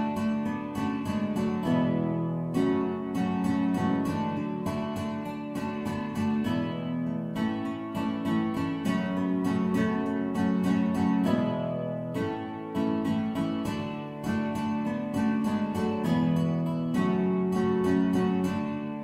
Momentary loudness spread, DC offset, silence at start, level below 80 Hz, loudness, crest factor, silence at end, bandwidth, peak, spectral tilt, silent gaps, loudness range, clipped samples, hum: 7 LU; under 0.1%; 0 s; -58 dBFS; -29 LUFS; 16 dB; 0 s; 14.5 kHz; -12 dBFS; -7.5 dB/octave; none; 4 LU; under 0.1%; none